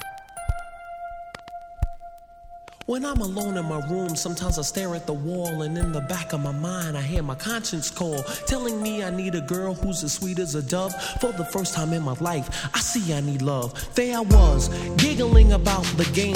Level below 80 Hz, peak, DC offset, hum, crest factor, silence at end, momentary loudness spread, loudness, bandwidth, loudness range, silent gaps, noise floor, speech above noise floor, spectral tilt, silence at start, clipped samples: -26 dBFS; -2 dBFS; under 0.1%; none; 22 dB; 0 s; 16 LU; -24 LUFS; 16.5 kHz; 9 LU; none; -44 dBFS; 22 dB; -5 dB/octave; 0 s; under 0.1%